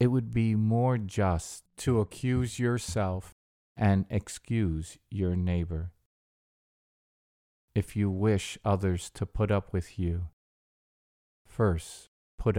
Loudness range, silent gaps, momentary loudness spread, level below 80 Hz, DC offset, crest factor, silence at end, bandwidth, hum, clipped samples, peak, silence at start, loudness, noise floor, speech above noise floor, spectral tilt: 5 LU; 3.32-3.75 s, 6.06-7.68 s, 10.33-11.45 s, 12.08-12.38 s; 10 LU; -46 dBFS; under 0.1%; 18 dB; 0 s; 15.5 kHz; none; under 0.1%; -12 dBFS; 0 s; -30 LUFS; under -90 dBFS; over 62 dB; -7 dB/octave